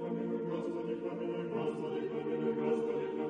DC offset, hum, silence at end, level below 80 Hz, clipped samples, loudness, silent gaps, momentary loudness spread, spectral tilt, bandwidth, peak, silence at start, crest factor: under 0.1%; none; 0 s; -78 dBFS; under 0.1%; -36 LUFS; none; 4 LU; -8 dB/octave; 9.4 kHz; -22 dBFS; 0 s; 14 dB